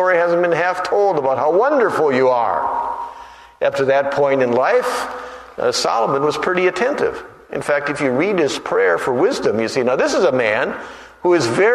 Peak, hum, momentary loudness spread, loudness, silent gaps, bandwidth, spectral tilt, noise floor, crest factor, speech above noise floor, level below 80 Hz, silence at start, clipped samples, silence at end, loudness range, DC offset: -2 dBFS; none; 10 LU; -17 LUFS; none; 13.5 kHz; -4.5 dB/octave; -39 dBFS; 14 dB; 22 dB; -56 dBFS; 0 s; under 0.1%; 0 s; 2 LU; under 0.1%